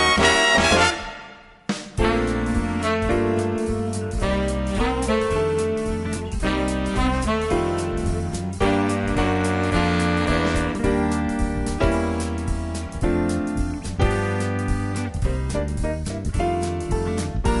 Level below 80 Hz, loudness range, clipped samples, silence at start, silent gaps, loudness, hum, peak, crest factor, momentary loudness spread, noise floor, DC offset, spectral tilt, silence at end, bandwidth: -30 dBFS; 3 LU; under 0.1%; 0 s; none; -22 LUFS; none; -2 dBFS; 20 dB; 7 LU; -43 dBFS; under 0.1%; -5 dB/octave; 0 s; 11.5 kHz